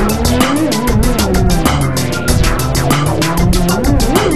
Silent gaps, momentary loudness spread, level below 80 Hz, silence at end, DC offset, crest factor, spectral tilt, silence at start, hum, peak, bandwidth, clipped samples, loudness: none; 2 LU; -18 dBFS; 0 s; 5%; 12 dB; -5 dB/octave; 0 s; none; 0 dBFS; 13.5 kHz; under 0.1%; -13 LUFS